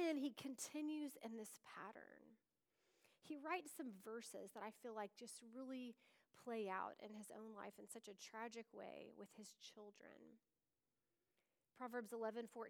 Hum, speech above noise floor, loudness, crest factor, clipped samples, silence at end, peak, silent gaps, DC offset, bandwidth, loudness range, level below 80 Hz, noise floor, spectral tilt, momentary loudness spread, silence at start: none; over 37 dB; -53 LUFS; 20 dB; under 0.1%; 0 s; -34 dBFS; none; under 0.1%; over 20 kHz; 6 LU; under -90 dBFS; under -90 dBFS; -3.5 dB/octave; 13 LU; 0 s